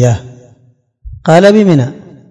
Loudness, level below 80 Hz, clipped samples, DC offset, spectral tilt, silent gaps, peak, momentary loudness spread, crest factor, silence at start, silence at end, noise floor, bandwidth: -9 LUFS; -38 dBFS; 3%; under 0.1%; -7 dB/octave; none; 0 dBFS; 13 LU; 10 dB; 0 s; 0.35 s; -50 dBFS; 12 kHz